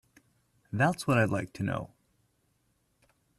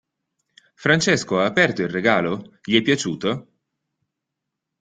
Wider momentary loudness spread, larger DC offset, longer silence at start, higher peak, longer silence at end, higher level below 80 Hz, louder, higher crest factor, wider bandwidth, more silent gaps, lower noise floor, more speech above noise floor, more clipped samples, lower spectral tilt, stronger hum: first, 12 LU vs 9 LU; neither; about the same, 0.7 s vs 0.8 s; second, -14 dBFS vs -2 dBFS; first, 1.55 s vs 1.4 s; about the same, -64 dBFS vs -60 dBFS; second, -30 LUFS vs -20 LUFS; about the same, 20 dB vs 22 dB; first, 14 kHz vs 9.6 kHz; neither; second, -73 dBFS vs -82 dBFS; second, 45 dB vs 62 dB; neither; first, -6.5 dB/octave vs -4.5 dB/octave; neither